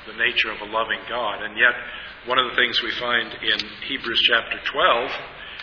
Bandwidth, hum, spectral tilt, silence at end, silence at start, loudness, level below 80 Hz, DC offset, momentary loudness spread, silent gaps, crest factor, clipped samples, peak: 5.4 kHz; none; -3 dB/octave; 0 s; 0 s; -21 LUFS; -54 dBFS; under 0.1%; 10 LU; none; 22 dB; under 0.1%; -2 dBFS